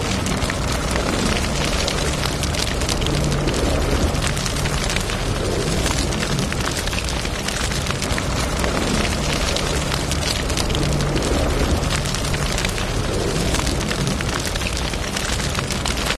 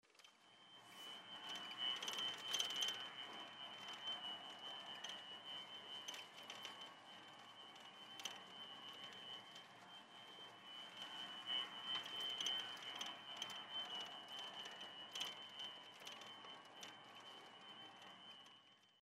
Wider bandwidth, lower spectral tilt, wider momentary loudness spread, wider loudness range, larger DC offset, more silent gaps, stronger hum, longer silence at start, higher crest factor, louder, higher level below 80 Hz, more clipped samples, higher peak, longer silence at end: second, 12 kHz vs 16 kHz; first, -4 dB/octave vs 0 dB/octave; second, 2 LU vs 16 LU; second, 1 LU vs 9 LU; first, 0.1% vs under 0.1%; neither; neither; about the same, 0 s vs 0.05 s; second, 18 dB vs 26 dB; first, -21 LUFS vs -49 LUFS; first, -26 dBFS vs under -90 dBFS; neither; first, -2 dBFS vs -26 dBFS; about the same, 0 s vs 0 s